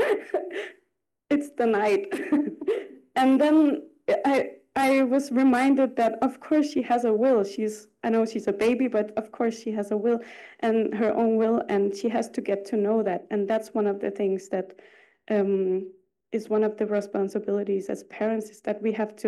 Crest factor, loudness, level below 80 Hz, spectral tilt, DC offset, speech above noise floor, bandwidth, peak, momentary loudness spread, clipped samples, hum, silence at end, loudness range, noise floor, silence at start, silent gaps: 14 dB; -25 LUFS; -70 dBFS; -6 dB/octave; under 0.1%; 52 dB; 12.5 kHz; -12 dBFS; 10 LU; under 0.1%; none; 0 s; 5 LU; -77 dBFS; 0 s; none